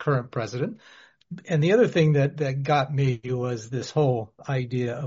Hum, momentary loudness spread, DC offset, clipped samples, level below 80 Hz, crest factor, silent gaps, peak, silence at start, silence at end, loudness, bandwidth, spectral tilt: none; 11 LU; under 0.1%; under 0.1%; -62 dBFS; 16 dB; none; -8 dBFS; 0 s; 0 s; -25 LUFS; 7.6 kHz; -6.5 dB/octave